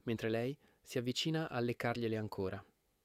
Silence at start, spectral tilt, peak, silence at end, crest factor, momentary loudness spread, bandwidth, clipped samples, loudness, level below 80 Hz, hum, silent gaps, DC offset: 0.05 s; -5.5 dB/octave; -22 dBFS; 0.4 s; 16 dB; 7 LU; 16 kHz; under 0.1%; -38 LUFS; -70 dBFS; none; none; under 0.1%